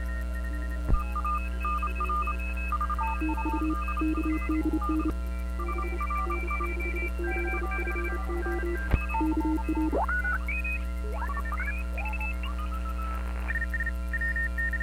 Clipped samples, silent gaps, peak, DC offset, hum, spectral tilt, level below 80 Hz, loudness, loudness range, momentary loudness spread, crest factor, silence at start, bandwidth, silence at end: under 0.1%; none; -8 dBFS; under 0.1%; none; -7 dB/octave; -32 dBFS; -30 LUFS; 2 LU; 5 LU; 20 dB; 0 s; 14.5 kHz; 0 s